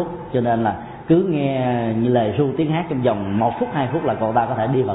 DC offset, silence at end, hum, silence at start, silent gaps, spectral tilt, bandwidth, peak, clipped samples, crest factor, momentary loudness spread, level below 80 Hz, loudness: under 0.1%; 0 s; none; 0 s; none; -12.5 dB/octave; 4 kHz; -4 dBFS; under 0.1%; 14 dB; 4 LU; -50 dBFS; -20 LUFS